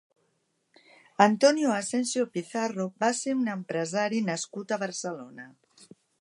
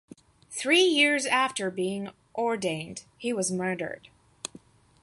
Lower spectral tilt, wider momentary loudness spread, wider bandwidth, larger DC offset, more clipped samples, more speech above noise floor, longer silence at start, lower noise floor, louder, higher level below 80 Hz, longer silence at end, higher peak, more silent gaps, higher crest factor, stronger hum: about the same, -4 dB/octave vs -3 dB/octave; second, 14 LU vs 20 LU; about the same, 11.5 kHz vs 11.5 kHz; neither; neither; first, 47 dB vs 27 dB; first, 1.2 s vs 0.5 s; first, -74 dBFS vs -54 dBFS; about the same, -27 LUFS vs -26 LUFS; second, -82 dBFS vs -70 dBFS; second, 0.35 s vs 0.55 s; first, -4 dBFS vs -10 dBFS; neither; first, 26 dB vs 20 dB; neither